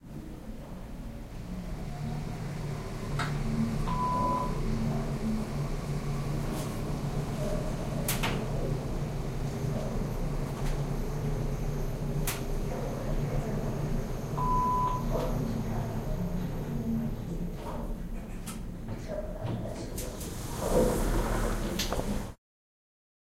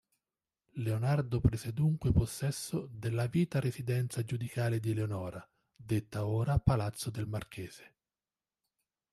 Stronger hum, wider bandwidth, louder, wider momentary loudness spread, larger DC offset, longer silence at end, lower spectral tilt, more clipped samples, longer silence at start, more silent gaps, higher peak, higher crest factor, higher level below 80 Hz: neither; first, 16 kHz vs 13.5 kHz; about the same, -33 LUFS vs -34 LUFS; about the same, 10 LU vs 10 LU; neither; second, 1 s vs 1.3 s; about the same, -6 dB/octave vs -7 dB/octave; neither; second, 0 s vs 0.75 s; neither; about the same, -14 dBFS vs -12 dBFS; about the same, 18 dB vs 22 dB; first, -36 dBFS vs -50 dBFS